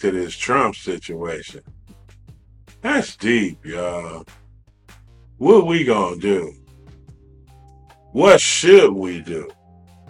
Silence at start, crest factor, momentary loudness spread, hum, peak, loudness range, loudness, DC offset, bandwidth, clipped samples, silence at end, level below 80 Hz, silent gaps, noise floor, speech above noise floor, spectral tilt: 0 s; 20 dB; 19 LU; none; 0 dBFS; 8 LU; -17 LUFS; under 0.1%; 11 kHz; under 0.1%; 0.6 s; -50 dBFS; none; -50 dBFS; 33 dB; -4 dB/octave